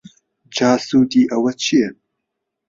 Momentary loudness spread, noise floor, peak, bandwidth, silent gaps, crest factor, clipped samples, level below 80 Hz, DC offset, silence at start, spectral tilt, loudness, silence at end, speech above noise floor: 7 LU; -78 dBFS; -2 dBFS; 7.6 kHz; none; 16 dB; under 0.1%; -58 dBFS; under 0.1%; 0.5 s; -4.5 dB/octave; -17 LUFS; 0.75 s; 62 dB